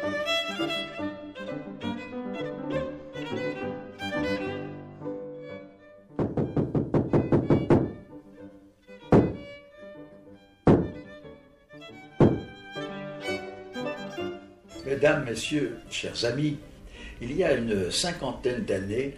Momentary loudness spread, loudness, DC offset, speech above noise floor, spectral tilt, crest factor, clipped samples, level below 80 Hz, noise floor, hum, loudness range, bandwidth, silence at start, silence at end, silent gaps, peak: 22 LU; -28 LUFS; under 0.1%; 24 dB; -6 dB/octave; 20 dB; under 0.1%; -48 dBFS; -52 dBFS; none; 7 LU; 14 kHz; 0 s; 0 s; none; -8 dBFS